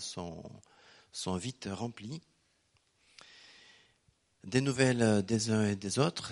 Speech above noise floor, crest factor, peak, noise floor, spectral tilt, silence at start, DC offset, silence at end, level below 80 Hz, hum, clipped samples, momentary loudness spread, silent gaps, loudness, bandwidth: 41 dB; 24 dB; -10 dBFS; -73 dBFS; -5 dB/octave; 0 s; under 0.1%; 0 s; -68 dBFS; none; under 0.1%; 21 LU; none; -32 LUFS; 11.5 kHz